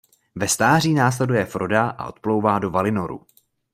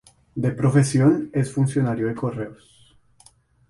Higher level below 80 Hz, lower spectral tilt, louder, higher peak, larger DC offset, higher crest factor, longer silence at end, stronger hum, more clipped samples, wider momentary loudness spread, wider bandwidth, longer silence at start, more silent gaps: about the same, -56 dBFS vs -54 dBFS; second, -5 dB/octave vs -7.5 dB/octave; about the same, -20 LUFS vs -21 LUFS; about the same, -4 dBFS vs -4 dBFS; neither; about the same, 18 dB vs 18 dB; second, 0.55 s vs 1.15 s; neither; neither; about the same, 12 LU vs 13 LU; first, 16 kHz vs 11.5 kHz; about the same, 0.35 s vs 0.35 s; neither